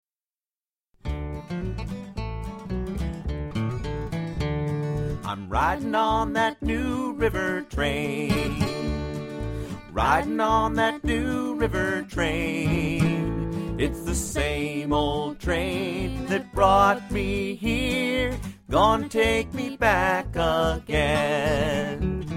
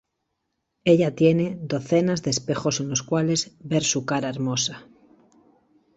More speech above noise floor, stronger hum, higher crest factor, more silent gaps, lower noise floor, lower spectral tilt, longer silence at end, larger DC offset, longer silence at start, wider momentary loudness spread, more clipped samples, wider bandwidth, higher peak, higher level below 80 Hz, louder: first, over 66 dB vs 55 dB; neither; about the same, 20 dB vs 20 dB; neither; first, under -90 dBFS vs -78 dBFS; about the same, -5.5 dB/octave vs -4.5 dB/octave; second, 0 s vs 1.15 s; neither; first, 1.05 s vs 0.85 s; first, 11 LU vs 7 LU; neither; first, 16.5 kHz vs 8.2 kHz; about the same, -6 dBFS vs -6 dBFS; first, -36 dBFS vs -60 dBFS; about the same, -25 LUFS vs -23 LUFS